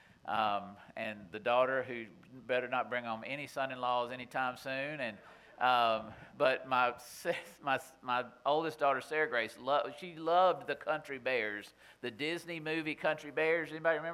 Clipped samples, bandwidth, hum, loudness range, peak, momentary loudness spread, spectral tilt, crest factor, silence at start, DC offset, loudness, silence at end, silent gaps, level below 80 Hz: under 0.1%; 16 kHz; none; 3 LU; -14 dBFS; 11 LU; -4.5 dB/octave; 20 dB; 0.25 s; under 0.1%; -35 LUFS; 0 s; none; -76 dBFS